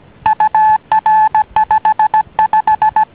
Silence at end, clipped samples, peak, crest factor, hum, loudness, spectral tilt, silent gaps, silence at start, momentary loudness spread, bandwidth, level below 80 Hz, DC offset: 0.1 s; under 0.1%; 0 dBFS; 12 dB; none; -12 LUFS; -7 dB/octave; none; 0.25 s; 3 LU; 4 kHz; -46 dBFS; 0.1%